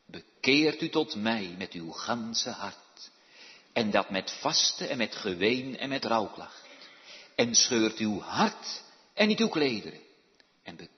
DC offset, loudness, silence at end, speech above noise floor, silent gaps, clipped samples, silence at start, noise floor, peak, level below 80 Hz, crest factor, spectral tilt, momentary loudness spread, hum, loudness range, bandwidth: under 0.1%; -28 LUFS; 0.1 s; 36 dB; none; under 0.1%; 0.1 s; -65 dBFS; -8 dBFS; -72 dBFS; 22 dB; -2.5 dB/octave; 24 LU; none; 5 LU; 6.4 kHz